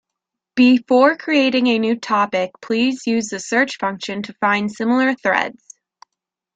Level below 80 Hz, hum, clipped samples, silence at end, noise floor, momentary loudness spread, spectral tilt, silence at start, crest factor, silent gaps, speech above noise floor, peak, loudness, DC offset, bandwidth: -64 dBFS; none; under 0.1%; 1.05 s; -82 dBFS; 9 LU; -4 dB/octave; 0.55 s; 18 dB; none; 65 dB; -2 dBFS; -18 LUFS; under 0.1%; 9 kHz